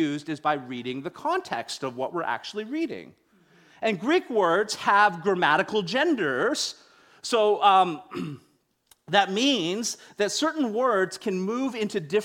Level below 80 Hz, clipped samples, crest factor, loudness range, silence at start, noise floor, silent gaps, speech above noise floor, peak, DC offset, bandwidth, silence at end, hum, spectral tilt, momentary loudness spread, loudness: -72 dBFS; under 0.1%; 20 dB; 7 LU; 0 s; -63 dBFS; none; 38 dB; -6 dBFS; under 0.1%; 17 kHz; 0 s; none; -3.5 dB/octave; 12 LU; -25 LUFS